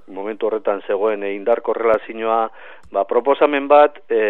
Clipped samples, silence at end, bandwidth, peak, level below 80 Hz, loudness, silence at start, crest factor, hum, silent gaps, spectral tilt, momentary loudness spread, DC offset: under 0.1%; 0 s; 4.1 kHz; 0 dBFS; -62 dBFS; -18 LUFS; 0.1 s; 18 dB; none; none; -6.5 dB/octave; 10 LU; 0.9%